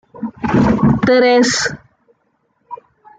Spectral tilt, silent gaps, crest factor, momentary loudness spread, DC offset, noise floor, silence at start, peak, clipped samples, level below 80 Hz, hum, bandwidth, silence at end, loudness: -5 dB/octave; none; 14 dB; 24 LU; under 0.1%; -63 dBFS; 0.15 s; -2 dBFS; under 0.1%; -40 dBFS; none; 9.4 kHz; 0.45 s; -13 LUFS